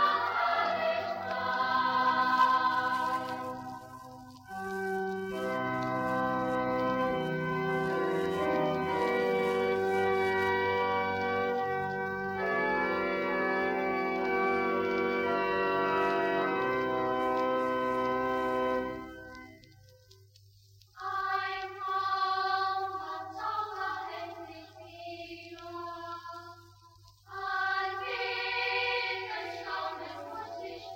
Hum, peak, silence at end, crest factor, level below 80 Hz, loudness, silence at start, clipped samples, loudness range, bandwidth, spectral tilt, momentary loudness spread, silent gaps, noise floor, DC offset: none; -12 dBFS; 0 s; 18 dB; -64 dBFS; -31 LUFS; 0 s; under 0.1%; 8 LU; 16 kHz; -5.5 dB/octave; 14 LU; none; -60 dBFS; under 0.1%